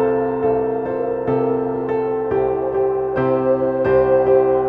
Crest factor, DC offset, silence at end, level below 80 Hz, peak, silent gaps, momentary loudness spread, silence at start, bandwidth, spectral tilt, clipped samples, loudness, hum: 12 dB; under 0.1%; 0 s; -46 dBFS; -4 dBFS; none; 6 LU; 0 s; 4.3 kHz; -10.5 dB/octave; under 0.1%; -18 LUFS; none